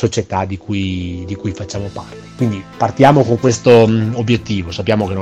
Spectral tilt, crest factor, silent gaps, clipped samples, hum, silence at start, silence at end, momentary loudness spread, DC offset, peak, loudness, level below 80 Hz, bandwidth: -6.5 dB/octave; 14 dB; none; 0.2%; none; 0 s; 0 s; 14 LU; under 0.1%; 0 dBFS; -15 LUFS; -46 dBFS; 9.6 kHz